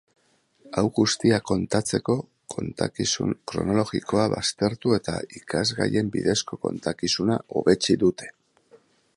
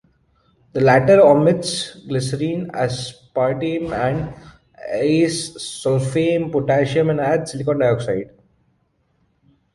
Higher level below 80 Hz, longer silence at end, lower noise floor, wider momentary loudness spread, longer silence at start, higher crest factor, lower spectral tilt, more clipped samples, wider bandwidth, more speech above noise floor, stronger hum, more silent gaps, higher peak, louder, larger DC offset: about the same, -52 dBFS vs -50 dBFS; second, 0.85 s vs 1.5 s; about the same, -61 dBFS vs -64 dBFS; second, 9 LU vs 14 LU; about the same, 0.65 s vs 0.75 s; about the same, 20 dB vs 18 dB; second, -4.5 dB/octave vs -6 dB/octave; neither; about the same, 11.5 kHz vs 11.5 kHz; second, 37 dB vs 47 dB; neither; neither; second, -6 dBFS vs -2 dBFS; second, -24 LUFS vs -19 LUFS; neither